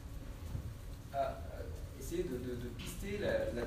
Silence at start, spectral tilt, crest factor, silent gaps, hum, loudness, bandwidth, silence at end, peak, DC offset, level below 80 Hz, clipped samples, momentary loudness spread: 0 s; -6 dB/octave; 16 dB; none; none; -42 LUFS; 15.5 kHz; 0 s; -24 dBFS; under 0.1%; -48 dBFS; under 0.1%; 11 LU